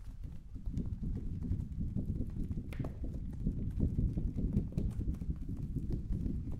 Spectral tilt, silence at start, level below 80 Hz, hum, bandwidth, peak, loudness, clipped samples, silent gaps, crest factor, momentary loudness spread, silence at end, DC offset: -10 dB/octave; 0 s; -40 dBFS; none; 10 kHz; -18 dBFS; -39 LUFS; under 0.1%; none; 18 dB; 7 LU; 0 s; under 0.1%